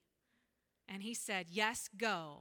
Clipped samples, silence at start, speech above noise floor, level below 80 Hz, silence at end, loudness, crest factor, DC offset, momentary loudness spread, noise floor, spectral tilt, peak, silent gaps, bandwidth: under 0.1%; 0.9 s; 43 dB; -78 dBFS; 0 s; -39 LUFS; 24 dB; under 0.1%; 10 LU; -83 dBFS; -2.5 dB/octave; -18 dBFS; none; 19 kHz